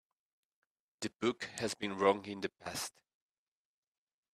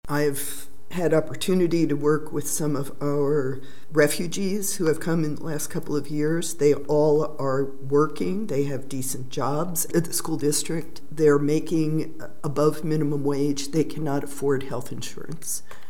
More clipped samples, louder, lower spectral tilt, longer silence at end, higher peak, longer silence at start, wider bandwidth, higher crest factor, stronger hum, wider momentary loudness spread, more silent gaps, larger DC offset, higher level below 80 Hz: neither; second, -37 LUFS vs -25 LUFS; second, -3.5 dB/octave vs -5.5 dB/octave; first, 1.45 s vs 0.15 s; second, -14 dBFS vs -6 dBFS; first, 1 s vs 0 s; second, 14 kHz vs 17 kHz; first, 26 dB vs 18 dB; neither; first, 12 LU vs 9 LU; neither; second, under 0.1% vs 4%; second, -76 dBFS vs -58 dBFS